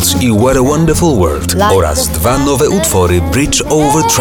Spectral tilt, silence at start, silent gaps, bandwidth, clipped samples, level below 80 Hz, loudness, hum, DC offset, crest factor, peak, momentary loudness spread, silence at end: -4.5 dB/octave; 0 s; none; 19 kHz; under 0.1%; -24 dBFS; -10 LUFS; none; 0.2%; 8 dB; -2 dBFS; 2 LU; 0 s